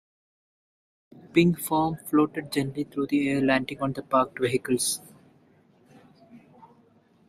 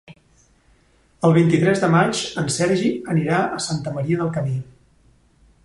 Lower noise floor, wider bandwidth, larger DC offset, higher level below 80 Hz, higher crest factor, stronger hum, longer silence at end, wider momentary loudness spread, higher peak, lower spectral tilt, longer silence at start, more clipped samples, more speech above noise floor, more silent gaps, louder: about the same, -60 dBFS vs -57 dBFS; first, 15.5 kHz vs 11.5 kHz; neither; second, -60 dBFS vs -54 dBFS; about the same, 22 dB vs 18 dB; neither; about the same, 0.9 s vs 1 s; about the same, 8 LU vs 9 LU; about the same, -6 dBFS vs -4 dBFS; about the same, -5 dB/octave vs -5.5 dB/octave; first, 1.35 s vs 0.1 s; neither; about the same, 35 dB vs 38 dB; neither; second, -26 LUFS vs -20 LUFS